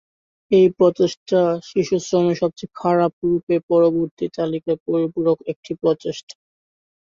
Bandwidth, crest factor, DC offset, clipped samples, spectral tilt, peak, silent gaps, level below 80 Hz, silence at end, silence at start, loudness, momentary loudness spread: 7.4 kHz; 16 dB; under 0.1%; under 0.1%; -7 dB/octave; -4 dBFS; 1.17-1.26 s, 3.13-3.22 s, 3.43-3.47 s, 3.63-3.68 s, 4.11-4.17 s, 4.80-4.86 s, 5.56-5.63 s, 6.23-6.27 s; -60 dBFS; 0.75 s; 0.5 s; -20 LUFS; 9 LU